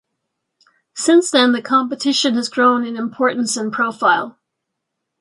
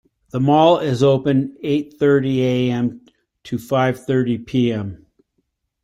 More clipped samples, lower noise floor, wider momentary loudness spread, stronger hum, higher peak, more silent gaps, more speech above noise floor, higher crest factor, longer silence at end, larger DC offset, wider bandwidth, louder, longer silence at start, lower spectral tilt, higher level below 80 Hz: neither; first, -78 dBFS vs -71 dBFS; second, 7 LU vs 12 LU; neither; about the same, -2 dBFS vs -2 dBFS; neither; first, 61 dB vs 54 dB; about the same, 16 dB vs 18 dB; about the same, 0.9 s vs 0.9 s; neither; second, 11.5 kHz vs 13 kHz; about the same, -16 LUFS vs -18 LUFS; first, 0.95 s vs 0.35 s; second, -2.5 dB/octave vs -7.5 dB/octave; second, -72 dBFS vs -54 dBFS